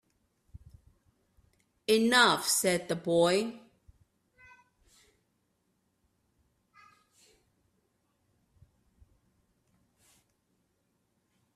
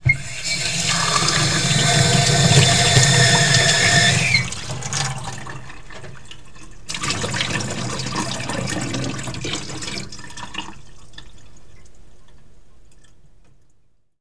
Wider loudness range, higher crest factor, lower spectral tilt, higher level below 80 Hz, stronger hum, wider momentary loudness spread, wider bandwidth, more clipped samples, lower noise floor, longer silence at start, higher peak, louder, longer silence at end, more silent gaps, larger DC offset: second, 7 LU vs 18 LU; first, 26 dB vs 20 dB; about the same, -3 dB/octave vs -3 dB/octave; second, -68 dBFS vs -42 dBFS; neither; second, 10 LU vs 20 LU; first, 15 kHz vs 11 kHz; neither; first, -77 dBFS vs -57 dBFS; first, 1.9 s vs 0 s; second, -10 dBFS vs 0 dBFS; second, -27 LUFS vs -17 LUFS; first, 7.95 s vs 0 s; neither; second, under 0.1% vs 2%